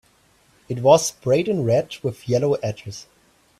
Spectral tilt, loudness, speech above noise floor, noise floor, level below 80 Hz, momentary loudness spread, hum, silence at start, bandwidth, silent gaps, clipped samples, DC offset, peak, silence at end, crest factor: -5.5 dB/octave; -20 LUFS; 38 dB; -58 dBFS; -58 dBFS; 17 LU; none; 0.7 s; 15 kHz; none; under 0.1%; under 0.1%; -2 dBFS; 0.55 s; 20 dB